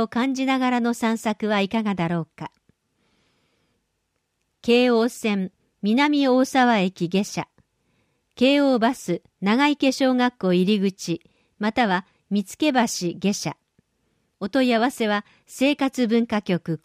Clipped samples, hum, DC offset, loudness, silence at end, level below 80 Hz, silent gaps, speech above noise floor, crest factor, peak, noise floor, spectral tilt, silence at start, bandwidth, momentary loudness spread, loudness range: under 0.1%; none; under 0.1%; -22 LUFS; 0.05 s; -64 dBFS; none; 53 dB; 16 dB; -6 dBFS; -75 dBFS; -5 dB/octave; 0 s; 15.5 kHz; 11 LU; 5 LU